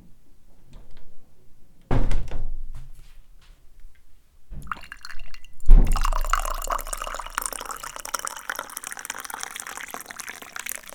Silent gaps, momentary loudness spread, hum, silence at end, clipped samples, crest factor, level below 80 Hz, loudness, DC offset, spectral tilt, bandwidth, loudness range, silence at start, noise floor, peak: none; 17 LU; none; 0.25 s; under 0.1%; 22 dB; -26 dBFS; -29 LUFS; under 0.1%; -3.5 dB/octave; 18.5 kHz; 9 LU; 0.05 s; -45 dBFS; 0 dBFS